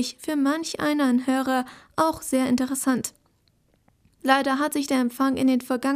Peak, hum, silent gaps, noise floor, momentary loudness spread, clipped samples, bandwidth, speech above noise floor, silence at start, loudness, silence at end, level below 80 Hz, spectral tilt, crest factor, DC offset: -4 dBFS; none; none; -65 dBFS; 6 LU; under 0.1%; 16 kHz; 42 dB; 0 s; -24 LUFS; 0 s; -62 dBFS; -3.5 dB/octave; 20 dB; under 0.1%